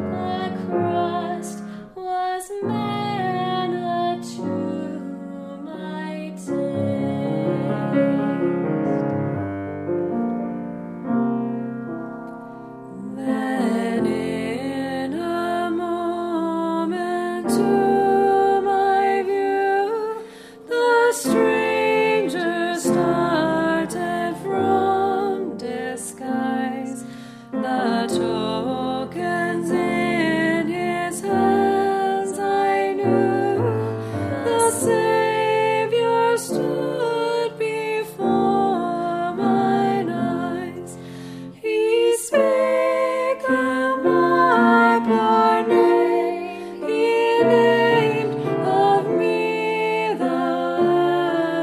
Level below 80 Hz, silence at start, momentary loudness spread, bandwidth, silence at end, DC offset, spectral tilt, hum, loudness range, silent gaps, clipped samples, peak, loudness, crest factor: -62 dBFS; 0 s; 12 LU; 15.5 kHz; 0 s; under 0.1%; -5.5 dB/octave; none; 8 LU; none; under 0.1%; -2 dBFS; -21 LUFS; 18 dB